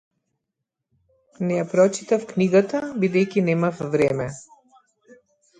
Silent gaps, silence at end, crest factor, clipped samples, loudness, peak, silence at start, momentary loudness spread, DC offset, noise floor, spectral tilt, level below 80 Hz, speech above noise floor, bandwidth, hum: none; 1.15 s; 18 dB; under 0.1%; -22 LUFS; -4 dBFS; 1.4 s; 9 LU; under 0.1%; -82 dBFS; -6.5 dB/octave; -62 dBFS; 61 dB; 9.4 kHz; none